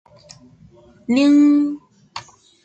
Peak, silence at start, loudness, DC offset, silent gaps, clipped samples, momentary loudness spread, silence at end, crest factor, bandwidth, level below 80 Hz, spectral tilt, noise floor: -6 dBFS; 1.1 s; -15 LUFS; under 0.1%; none; under 0.1%; 23 LU; 0.45 s; 14 dB; 8.2 kHz; -62 dBFS; -5 dB/octave; -48 dBFS